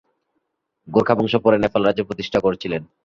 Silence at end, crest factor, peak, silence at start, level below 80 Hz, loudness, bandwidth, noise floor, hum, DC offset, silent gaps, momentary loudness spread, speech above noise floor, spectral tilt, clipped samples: 0.2 s; 20 dB; -2 dBFS; 0.85 s; -50 dBFS; -19 LUFS; 7.4 kHz; -74 dBFS; none; under 0.1%; none; 8 LU; 55 dB; -7 dB/octave; under 0.1%